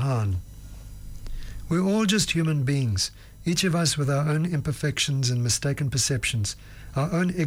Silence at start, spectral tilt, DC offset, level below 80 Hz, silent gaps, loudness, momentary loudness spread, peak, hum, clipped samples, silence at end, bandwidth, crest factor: 0 s; -4.5 dB/octave; under 0.1%; -44 dBFS; none; -25 LUFS; 19 LU; -12 dBFS; none; under 0.1%; 0 s; 19.5 kHz; 14 dB